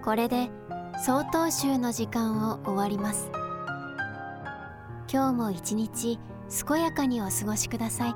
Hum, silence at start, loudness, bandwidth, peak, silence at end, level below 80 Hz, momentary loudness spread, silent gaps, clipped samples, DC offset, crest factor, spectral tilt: none; 0 s; -29 LUFS; 19 kHz; -12 dBFS; 0 s; -56 dBFS; 11 LU; none; under 0.1%; under 0.1%; 18 dB; -4.5 dB/octave